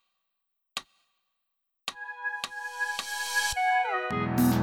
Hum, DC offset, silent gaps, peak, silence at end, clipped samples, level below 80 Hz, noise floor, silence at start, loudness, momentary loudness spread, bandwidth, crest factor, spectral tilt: none; under 0.1%; none; -12 dBFS; 0 s; under 0.1%; -54 dBFS; -81 dBFS; 0.75 s; -30 LUFS; 14 LU; 18.5 kHz; 18 dB; -4 dB/octave